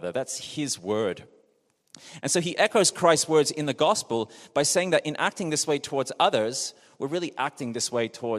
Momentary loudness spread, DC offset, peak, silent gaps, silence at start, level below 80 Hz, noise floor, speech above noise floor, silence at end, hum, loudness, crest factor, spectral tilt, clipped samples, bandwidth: 10 LU; under 0.1%; -6 dBFS; none; 0 s; -72 dBFS; -68 dBFS; 43 dB; 0 s; none; -25 LUFS; 20 dB; -3 dB/octave; under 0.1%; 14 kHz